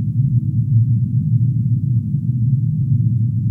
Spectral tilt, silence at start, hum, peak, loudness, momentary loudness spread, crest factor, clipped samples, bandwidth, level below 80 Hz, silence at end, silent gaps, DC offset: -13.5 dB/octave; 0 s; none; -6 dBFS; -17 LUFS; 2 LU; 12 dB; under 0.1%; 0.4 kHz; -40 dBFS; 0 s; none; under 0.1%